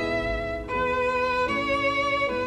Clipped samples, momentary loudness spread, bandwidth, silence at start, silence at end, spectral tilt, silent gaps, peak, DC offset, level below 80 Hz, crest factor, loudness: under 0.1%; 5 LU; 12 kHz; 0 s; 0 s; -5 dB/octave; none; -14 dBFS; under 0.1%; -42 dBFS; 12 dB; -25 LUFS